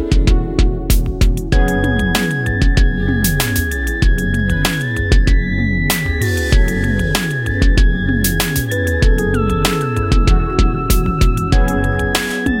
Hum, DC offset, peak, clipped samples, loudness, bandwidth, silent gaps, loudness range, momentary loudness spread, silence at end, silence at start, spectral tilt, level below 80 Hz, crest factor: none; under 0.1%; 0 dBFS; under 0.1%; -16 LUFS; 17 kHz; none; 1 LU; 3 LU; 0 s; 0 s; -5 dB/octave; -16 dBFS; 14 dB